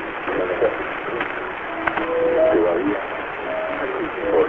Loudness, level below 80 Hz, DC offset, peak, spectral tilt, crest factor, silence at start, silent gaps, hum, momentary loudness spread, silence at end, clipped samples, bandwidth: -22 LUFS; -50 dBFS; under 0.1%; -4 dBFS; -7.5 dB/octave; 18 dB; 0 s; none; none; 9 LU; 0 s; under 0.1%; 4.4 kHz